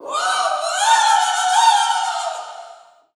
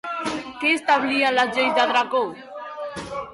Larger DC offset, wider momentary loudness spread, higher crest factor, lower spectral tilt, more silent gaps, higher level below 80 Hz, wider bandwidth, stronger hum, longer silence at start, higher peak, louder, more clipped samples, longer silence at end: neither; about the same, 15 LU vs 14 LU; about the same, 16 dB vs 14 dB; second, 4 dB/octave vs -3 dB/octave; neither; second, -88 dBFS vs -60 dBFS; first, 14 kHz vs 11.5 kHz; neither; about the same, 0 s vs 0.05 s; first, -2 dBFS vs -8 dBFS; first, -16 LUFS vs -21 LUFS; neither; first, 0.4 s vs 0 s